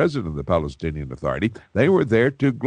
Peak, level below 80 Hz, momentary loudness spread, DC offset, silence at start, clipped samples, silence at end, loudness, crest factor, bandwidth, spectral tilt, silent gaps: -4 dBFS; -42 dBFS; 11 LU; under 0.1%; 0 s; under 0.1%; 0 s; -22 LUFS; 16 dB; 9.8 kHz; -8 dB/octave; none